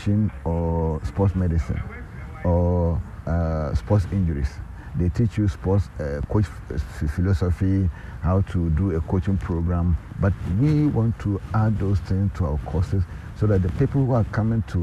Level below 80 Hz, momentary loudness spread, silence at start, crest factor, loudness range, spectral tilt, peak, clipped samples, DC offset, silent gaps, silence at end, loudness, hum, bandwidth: -32 dBFS; 8 LU; 0 s; 14 dB; 2 LU; -9.5 dB/octave; -8 dBFS; under 0.1%; under 0.1%; none; 0 s; -24 LUFS; none; 8.6 kHz